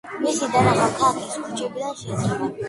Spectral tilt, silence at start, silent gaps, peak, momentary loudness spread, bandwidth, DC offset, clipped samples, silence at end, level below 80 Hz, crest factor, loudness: -5 dB/octave; 0.05 s; none; -4 dBFS; 10 LU; 11.5 kHz; under 0.1%; under 0.1%; 0 s; -54 dBFS; 18 dB; -22 LUFS